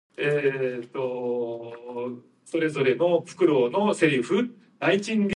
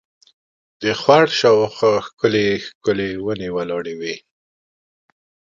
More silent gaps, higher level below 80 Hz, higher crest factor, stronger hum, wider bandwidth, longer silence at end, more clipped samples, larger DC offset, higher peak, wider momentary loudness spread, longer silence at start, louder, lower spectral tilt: second, none vs 2.13-2.17 s, 2.75-2.81 s; second, -70 dBFS vs -56 dBFS; about the same, 18 dB vs 20 dB; neither; first, 11.5 kHz vs 7.6 kHz; second, 0 s vs 1.4 s; neither; neither; second, -6 dBFS vs 0 dBFS; about the same, 12 LU vs 12 LU; second, 0.2 s vs 0.8 s; second, -25 LUFS vs -18 LUFS; about the same, -6 dB/octave vs -5 dB/octave